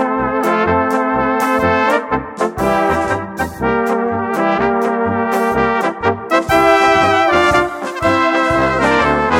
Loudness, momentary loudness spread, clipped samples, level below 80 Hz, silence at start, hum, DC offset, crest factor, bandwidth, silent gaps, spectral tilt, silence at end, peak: -14 LUFS; 7 LU; under 0.1%; -38 dBFS; 0 s; none; under 0.1%; 14 dB; 17 kHz; none; -5.5 dB/octave; 0 s; 0 dBFS